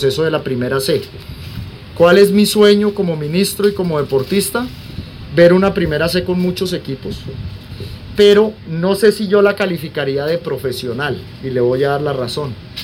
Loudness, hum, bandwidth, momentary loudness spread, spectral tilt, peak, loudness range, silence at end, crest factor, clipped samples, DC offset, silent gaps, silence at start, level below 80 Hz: -15 LUFS; none; 16.5 kHz; 19 LU; -5.5 dB/octave; 0 dBFS; 3 LU; 0 s; 14 dB; under 0.1%; under 0.1%; none; 0 s; -40 dBFS